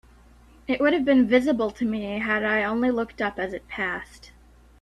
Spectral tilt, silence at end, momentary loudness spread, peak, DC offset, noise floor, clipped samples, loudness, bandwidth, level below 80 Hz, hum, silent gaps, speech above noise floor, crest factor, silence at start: -6 dB/octave; 0.55 s; 12 LU; -6 dBFS; under 0.1%; -52 dBFS; under 0.1%; -24 LUFS; 11.5 kHz; -52 dBFS; none; none; 29 dB; 20 dB; 0.7 s